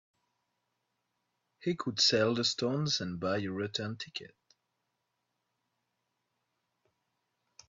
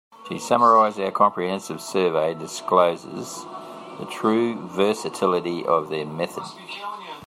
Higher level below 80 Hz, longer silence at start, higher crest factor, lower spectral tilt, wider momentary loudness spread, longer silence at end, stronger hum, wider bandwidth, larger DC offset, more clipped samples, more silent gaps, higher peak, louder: second, -76 dBFS vs -70 dBFS; first, 1.6 s vs 0.2 s; about the same, 22 dB vs 20 dB; about the same, -4 dB/octave vs -5 dB/octave; about the same, 14 LU vs 16 LU; first, 3.4 s vs 0 s; first, 60 Hz at -60 dBFS vs none; second, 7.8 kHz vs 16 kHz; neither; neither; neither; second, -14 dBFS vs -4 dBFS; second, -31 LUFS vs -22 LUFS